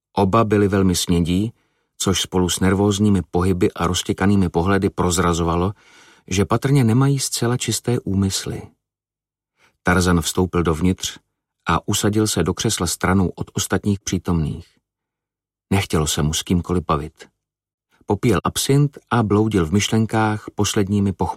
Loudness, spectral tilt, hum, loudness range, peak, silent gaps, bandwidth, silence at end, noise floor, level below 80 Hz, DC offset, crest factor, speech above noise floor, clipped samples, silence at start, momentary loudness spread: -19 LUFS; -5 dB/octave; none; 4 LU; -4 dBFS; 17.74-17.78 s; 16 kHz; 0 s; under -90 dBFS; -40 dBFS; under 0.1%; 16 dB; over 71 dB; under 0.1%; 0.15 s; 7 LU